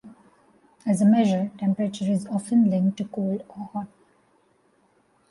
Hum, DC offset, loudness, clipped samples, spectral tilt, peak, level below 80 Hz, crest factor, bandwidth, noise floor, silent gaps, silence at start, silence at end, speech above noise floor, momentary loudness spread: none; under 0.1%; -24 LUFS; under 0.1%; -7.5 dB/octave; -10 dBFS; -68 dBFS; 14 dB; 11.5 kHz; -64 dBFS; none; 0.05 s; 1.45 s; 41 dB; 15 LU